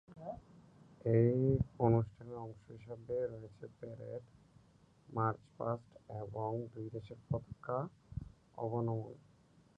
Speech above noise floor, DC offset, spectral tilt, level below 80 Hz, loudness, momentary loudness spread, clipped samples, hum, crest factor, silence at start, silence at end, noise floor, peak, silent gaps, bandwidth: 29 dB; under 0.1%; -11 dB/octave; -60 dBFS; -38 LUFS; 19 LU; under 0.1%; none; 22 dB; 0.1 s; 0.6 s; -67 dBFS; -16 dBFS; none; 5.2 kHz